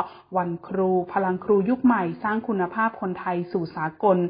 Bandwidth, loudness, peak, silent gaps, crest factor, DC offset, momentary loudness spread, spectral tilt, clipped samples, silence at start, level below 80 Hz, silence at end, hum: 5.2 kHz; -24 LUFS; -6 dBFS; none; 16 dB; under 0.1%; 7 LU; -12 dB/octave; under 0.1%; 0 s; -62 dBFS; 0 s; none